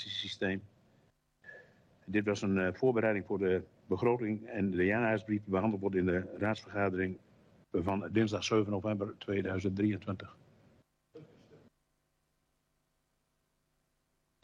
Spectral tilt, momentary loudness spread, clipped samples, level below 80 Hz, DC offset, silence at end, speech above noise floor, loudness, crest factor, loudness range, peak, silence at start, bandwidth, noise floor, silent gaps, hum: -6.5 dB/octave; 9 LU; under 0.1%; -70 dBFS; under 0.1%; 2.85 s; 47 dB; -33 LUFS; 18 dB; 7 LU; -18 dBFS; 0 s; 9.6 kHz; -79 dBFS; none; none